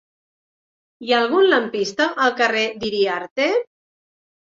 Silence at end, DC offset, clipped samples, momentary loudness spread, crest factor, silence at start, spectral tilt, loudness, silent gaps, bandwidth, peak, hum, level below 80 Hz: 0.9 s; under 0.1%; under 0.1%; 8 LU; 18 dB; 1 s; -3.5 dB/octave; -19 LUFS; 3.31-3.36 s; 7.6 kHz; -4 dBFS; none; -64 dBFS